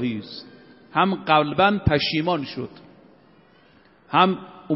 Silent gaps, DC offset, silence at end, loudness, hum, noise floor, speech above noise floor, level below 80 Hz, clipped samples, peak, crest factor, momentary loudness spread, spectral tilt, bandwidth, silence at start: none; under 0.1%; 0 s; -21 LUFS; none; -55 dBFS; 33 dB; -48 dBFS; under 0.1%; -2 dBFS; 20 dB; 16 LU; -3.5 dB/octave; 5.8 kHz; 0 s